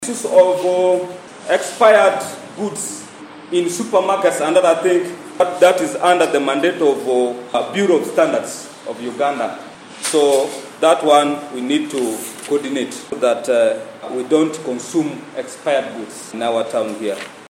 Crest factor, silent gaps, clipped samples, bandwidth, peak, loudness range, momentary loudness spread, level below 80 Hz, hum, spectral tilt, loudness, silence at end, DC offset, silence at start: 16 dB; none; under 0.1%; 16.5 kHz; 0 dBFS; 4 LU; 15 LU; -70 dBFS; none; -3.5 dB/octave; -17 LUFS; 0.05 s; under 0.1%; 0 s